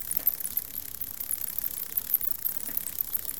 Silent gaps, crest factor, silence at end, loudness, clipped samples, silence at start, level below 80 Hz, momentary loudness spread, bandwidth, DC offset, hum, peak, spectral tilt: none; 24 dB; 0 s; -28 LUFS; under 0.1%; 0 s; -60 dBFS; 8 LU; 19 kHz; 0.4%; none; -8 dBFS; -0.5 dB/octave